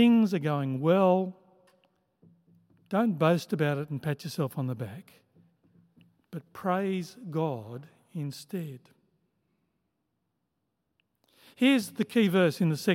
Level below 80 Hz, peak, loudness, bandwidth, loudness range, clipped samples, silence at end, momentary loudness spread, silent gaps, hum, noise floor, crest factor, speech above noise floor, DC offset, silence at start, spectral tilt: -80 dBFS; -10 dBFS; -28 LUFS; 16.5 kHz; 14 LU; under 0.1%; 0 s; 18 LU; none; none; -80 dBFS; 20 dB; 53 dB; under 0.1%; 0 s; -6.5 dB/octave